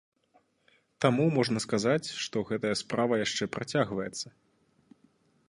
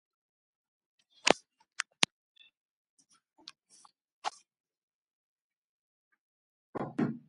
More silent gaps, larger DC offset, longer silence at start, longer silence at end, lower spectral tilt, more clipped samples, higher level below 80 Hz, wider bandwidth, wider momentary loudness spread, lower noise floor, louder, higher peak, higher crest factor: second, none vs 2.12-2.35 s, 2.57-2.97 s, 4.12-4.22 s, 4.60-4.64 s, 4.83-4.88 s, 4.94-5.50 s, 5.57-6.11 s, 6.19-6.73 s; neither; second, 1 s vs 1.25 s; first, 1.2 s vs 0.1 s; first, -5 dB/octave vs -2.5 dB/octave; neither; first, -66 dBFS vs -80 dBFS; about the same, 11.5 kHz vs 11.5 kHz; second, 8 LU vs 24 LU; first, -68 dBFS vs -64 dBFS; first, -29 LUFS vs -33 LUFS; second, -8 dBFS vs 0 dBFS; second, 24 dB vs 40 dB